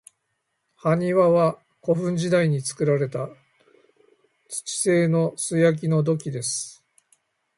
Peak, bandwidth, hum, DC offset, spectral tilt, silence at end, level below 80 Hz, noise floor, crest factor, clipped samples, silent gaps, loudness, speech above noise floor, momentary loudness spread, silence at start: -8 dBFS; 11.5 kHz; none; under 0.1%; -5.5 dB/octave; 0.85 s; -68 dBFS; -76 dBFS; 16 dB; under 0.1%; none; -23 LUFS; 54 dB; 13 LU; 0.85 s